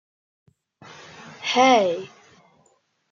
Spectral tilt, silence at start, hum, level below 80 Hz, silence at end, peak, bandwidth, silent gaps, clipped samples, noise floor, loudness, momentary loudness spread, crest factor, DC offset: -3 dB/octave; 1.2 s; none; -78 dBFS; 1.05 s; -4 dBFS; 7.6 kHz; none; under 0.1%; -65 dBFS; -20 LUFS; 26 LU; 22 dB; under 0.1%